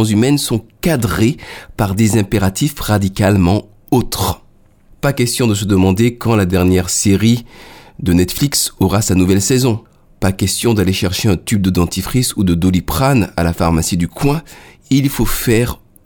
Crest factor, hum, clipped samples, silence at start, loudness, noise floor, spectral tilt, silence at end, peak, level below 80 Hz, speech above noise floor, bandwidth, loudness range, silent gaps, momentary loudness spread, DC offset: 14 dB; none; under 0.1%; 0 s; -15 LUFS; -47 dBFS; -5 dB/octave; 0.3 s; 0 dBFS; -32 dBFS; 33 dB; over 20 kHz; 2 LU; none; 6 LU; under 0.1%